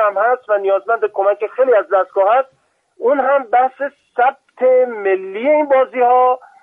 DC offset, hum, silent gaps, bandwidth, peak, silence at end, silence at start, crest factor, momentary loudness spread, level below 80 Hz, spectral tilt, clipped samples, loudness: under 0.1%; none; none; 3.7 kHz; -4 dBFS; 0.25 s; 0 s; 12 dB; 6 LU; -70 dBFS; -6 dB/octave; under 0.1%; -15 LUFS